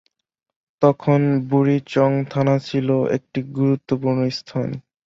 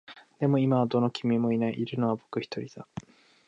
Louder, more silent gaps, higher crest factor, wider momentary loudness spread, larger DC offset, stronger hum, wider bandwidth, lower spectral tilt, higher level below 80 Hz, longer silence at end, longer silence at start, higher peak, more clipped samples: first, -20 LUFS vs -28 LUFS; neither; about the same, 16 dB vs 16 dB; second, 7 LU vs 17 LU; neither; neither; about the same, 7.4 kHz vs 7.6 kHz; about the same, -8.5 dB/octave vs -8 dB/octave; first, -60 dBFS vs -68 dBFS; second, 0.25 s vs 0.45 s; first, 0.8 s vs 0.1 s; first, -2 dBFS vs -12 dBFS; neither